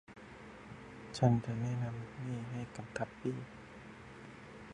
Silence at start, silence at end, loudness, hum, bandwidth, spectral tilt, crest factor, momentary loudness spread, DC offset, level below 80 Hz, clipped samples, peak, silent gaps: 0.1 s; 0 s; -38 LUFS; none; 10.5 kHz; -7.5 dB/octave; 24 dB; 20 LU; under 0.1%; -64 dBFS; under 0.1%; -16 dBFS; none